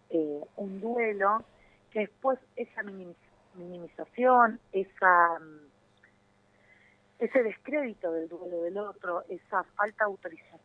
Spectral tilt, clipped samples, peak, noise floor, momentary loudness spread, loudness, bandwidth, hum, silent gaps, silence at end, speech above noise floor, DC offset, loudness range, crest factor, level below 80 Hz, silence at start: -8 dB/octave; under 0.1%; -8 dBFS; -66 dBFS; 19 LU; -29 LUFS; 4.2 kHz; 50 Hz at -70 dBFS; none; 0.05 s; 36 dB; under 0.1%; 6 LU; 22 dB; -76 dBFS; 0.1 s